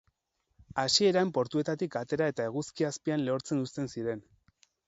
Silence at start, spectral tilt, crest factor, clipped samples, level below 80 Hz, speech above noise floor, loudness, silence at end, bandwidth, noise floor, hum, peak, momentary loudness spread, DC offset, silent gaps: 0.75 s; -4.5 dB/octave; 20 dB; under 0.1%; -68 dBFS; 49 dB; -30 LUFS; 0.65 s; 8.2 kHz; -79 dBFS; none; -12 dBFS; 11 LU; under 0.1%; none